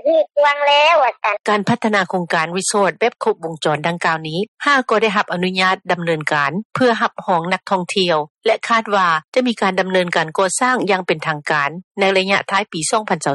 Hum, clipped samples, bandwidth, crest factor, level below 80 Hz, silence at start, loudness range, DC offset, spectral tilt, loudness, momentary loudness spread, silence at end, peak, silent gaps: none; under 0.1%; 11.5 kHz; 14 dB; -64 dBFS; 0.05 s; 2 LU; under 0.1%; -3.5 dB/octave; -17 LUFS; 5 LU; 0 s; -2 dBFS; 4.48-4.55 s, 6.65-6.70 s, 8.30-8.35 s, 9.24-9.32 s, 11.84-11.95 s